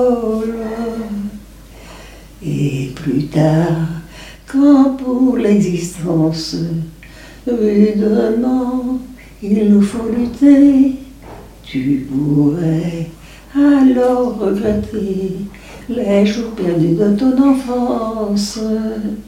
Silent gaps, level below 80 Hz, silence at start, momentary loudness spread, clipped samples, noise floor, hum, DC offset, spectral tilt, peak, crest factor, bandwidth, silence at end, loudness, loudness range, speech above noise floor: none; -40 dBFS; 0 s; 15 LU; under 0.1%; -37 dBFS; none; under 0.1%; -7.5 dB/octave; 0 dBFS; 14 dB; 14.5 kHz; 0.05 s; -15 LUFS; 5 LU; 23 dB